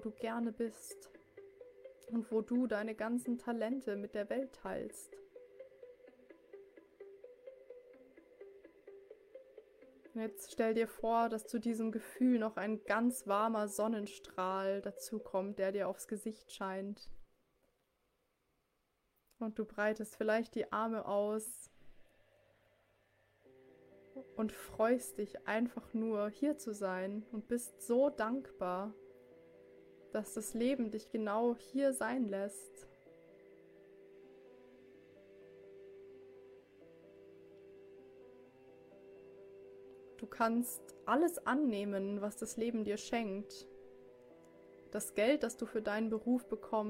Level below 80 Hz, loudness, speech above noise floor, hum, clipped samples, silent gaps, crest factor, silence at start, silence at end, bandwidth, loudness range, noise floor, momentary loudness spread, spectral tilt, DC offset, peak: -74 dBFS; -38 LUFS; 44 dB; none; under 0.1%; none; 20 dB; 0 s; 0 s; 16.5 kHz; 22 LU; -81 dBFS; 24 LU; -5 dB/octave; under 0.1%; -18 dBFS